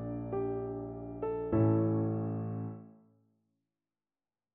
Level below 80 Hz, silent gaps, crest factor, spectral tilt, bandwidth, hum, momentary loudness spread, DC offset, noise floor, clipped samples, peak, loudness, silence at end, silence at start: -58 dBFS; none; 18 dB; -12.5 dB/octave; 2.8 kHz; none; 13 LU; under 0.1%; under -90 dBFS; under 0.1%; -16 dBFS; -34 LUFS; 1.65 s; 0 s